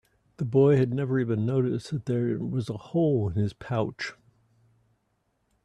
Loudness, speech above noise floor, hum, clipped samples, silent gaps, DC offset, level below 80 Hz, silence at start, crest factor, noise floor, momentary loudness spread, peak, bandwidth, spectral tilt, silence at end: -27 LUFS; 48 dB; none; under 0.1%; none; under 0.1%; -60 dBFS; 0.4 s; 18 dB; -73 dBFS; 11 LU; -10 dBFS; 10 kHz; -8.5 dB/octave; 1.5 s